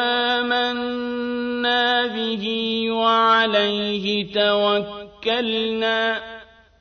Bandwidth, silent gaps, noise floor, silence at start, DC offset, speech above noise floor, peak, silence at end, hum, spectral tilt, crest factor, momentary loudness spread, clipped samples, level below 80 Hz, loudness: 6.6 kHz; none; -42 dBFS; 0 s; under 0.1%; 22 dB; -6 dBFS; 0.35 s; none; -5 dB/octave; 16 dB; 9 LU; under 0.1%; -58 dBFS; -20 LUFS